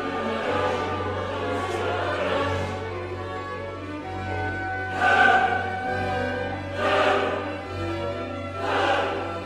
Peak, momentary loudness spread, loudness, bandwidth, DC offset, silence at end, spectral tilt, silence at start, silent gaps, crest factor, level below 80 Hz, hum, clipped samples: -6 dBFS; 11 LU; -25 LUFS; 12 kHz; 0.1%; 0 s; -5.5 dB/octave; 0 s; none; 18 dB; -52 dBFS; none; under 0.1%